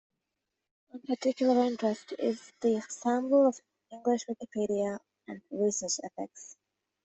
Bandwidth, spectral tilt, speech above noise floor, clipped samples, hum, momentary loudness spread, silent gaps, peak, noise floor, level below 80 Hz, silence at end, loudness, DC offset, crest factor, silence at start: 8.4 kHz; -4.5 dB/octave; 56 dB; under 0.1%; none; 20 LU; none; -14 dBFS; -86 dBFS; -76 dBFS; 0.5 s; -30 LUFS; under 0.1%; 18 dB; 0.95 s